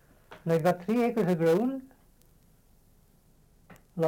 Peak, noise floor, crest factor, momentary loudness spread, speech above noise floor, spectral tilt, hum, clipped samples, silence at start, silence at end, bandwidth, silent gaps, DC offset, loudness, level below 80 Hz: -14 dBFS; -61 dBFS; 16 dB; 15 LU; 35 dB; -7.5 dB/octave; none; under 0.1%; 0.3 s; 0 s; 17 kHz; none; under 0.1%; -27 LUFS; -64 dBFS